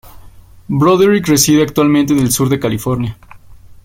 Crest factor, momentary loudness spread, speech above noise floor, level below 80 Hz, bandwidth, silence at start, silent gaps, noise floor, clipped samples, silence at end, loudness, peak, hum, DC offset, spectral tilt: 14 dB; 9 LU; 26 dB; -42 dBFS; 16.5 kHz; 0.05 s; none; -38 dBFS; under 0.1%; 0.1 s; -12 LUFS; 0 dBFS; none; under 0.1%; -5 dB/octave